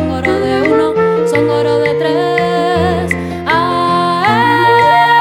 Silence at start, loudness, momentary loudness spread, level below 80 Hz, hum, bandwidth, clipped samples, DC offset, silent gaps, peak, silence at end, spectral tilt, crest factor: 0 s; -12 LUFS; 6 LU; -40 dBFS; none; 16 kHz; under 0.1%; under 0.1%; none; 0 dBFS; 0 s; -6 dB/octave; 12 dB